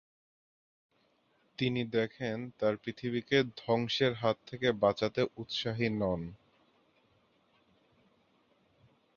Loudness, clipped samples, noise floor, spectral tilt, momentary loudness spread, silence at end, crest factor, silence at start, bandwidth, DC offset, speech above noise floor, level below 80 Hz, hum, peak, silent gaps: -33 LUFS; under 0.1%; -72 dBFS; -6 dB/octave; 8 LU; 2.8 s; 22 dB; 1.6 s; 7.2 kHz; under 0.1%; 40 dB; -64 dBFS; none; -12 dBFS; none